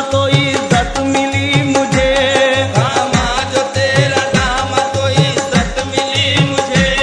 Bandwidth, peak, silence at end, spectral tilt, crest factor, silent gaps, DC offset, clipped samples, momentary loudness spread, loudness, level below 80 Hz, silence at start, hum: 10.5 kHz; 0 dBFS; 0 s; -4.5 dB/octave; 14 dB; none; under 0.1%; under 0.1%; 3 LU; -13 LUFS; -30 dBFS; 0 s; none